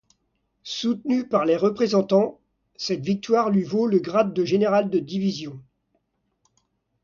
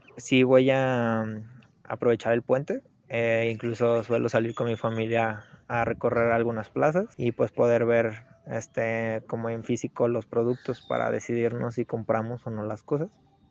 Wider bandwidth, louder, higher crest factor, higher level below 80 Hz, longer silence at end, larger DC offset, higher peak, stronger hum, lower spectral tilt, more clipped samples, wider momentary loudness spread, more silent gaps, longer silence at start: second, 7.2 kHz vs 8 kHz; first, -23 LUFS vs -27 LUFS; about the same, 18 dB vs 18 dB; about the same, -66 dBFS vs -64 dBFS; first, 1.45 s vs 0.45 s; neither; about the same, -6 dBFS vs -8 dBFS; neither; about the same, -6.5 dB/octave vs -6.5 dB/octave; neither; about the same, 9 LU vs 10 LU; neither; first, 0.65 s vs 0.15 s